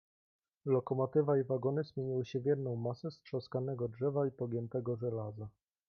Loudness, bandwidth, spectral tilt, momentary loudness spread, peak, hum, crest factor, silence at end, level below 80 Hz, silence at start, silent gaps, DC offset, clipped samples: -36 LUFS; 6.6 kHz; -9.5 dB/octave; 10 LU; -20 dBFS; none; 16 dB; 0.4 s; -74 dBFS; 0.65 s; none; under 0.1%; under 0.1%